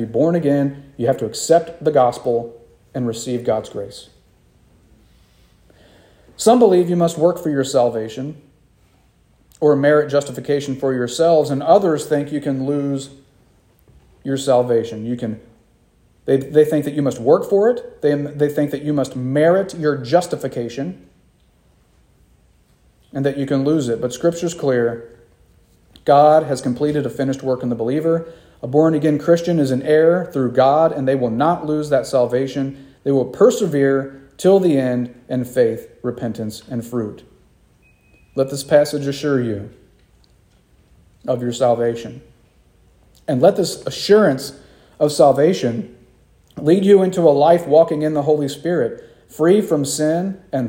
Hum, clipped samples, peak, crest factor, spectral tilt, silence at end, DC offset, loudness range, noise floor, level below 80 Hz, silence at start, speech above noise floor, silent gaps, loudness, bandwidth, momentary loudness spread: none; under 0.1%; 0 dBFS; 18 dB; -6 dB/octave; 0 s; under 0.1%; 8 LU; -55 dBFS; -56 dBFS; 0 s; 39 dB; none; -17 LUFS; 16.5 kHz; 13 LU